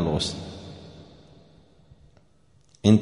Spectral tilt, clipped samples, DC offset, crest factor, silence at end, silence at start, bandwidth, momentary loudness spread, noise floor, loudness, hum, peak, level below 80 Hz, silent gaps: -6.5 dB/octave; under 0.1%; under 0.1%; 24 dB; 0 s; 0 s; 10.5 kHz; 25 LU; -61 dBFS; -26 LUFS; none; -4 dBFS; -50 dBFS; none